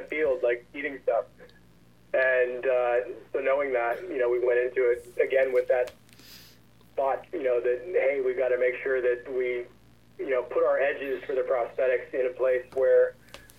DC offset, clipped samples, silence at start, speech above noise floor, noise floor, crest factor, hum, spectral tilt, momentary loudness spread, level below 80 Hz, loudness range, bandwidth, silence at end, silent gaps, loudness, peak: 0.1%; under 0.1%; 0 s; 32 dB; -58 dBFS; 14 dB; none; -5.5 dB/octave; 7 LU; -66 dBFS; 2 LU; 12.5 kHz; 0.2 s; none; -27 LUFS; -12 dBFS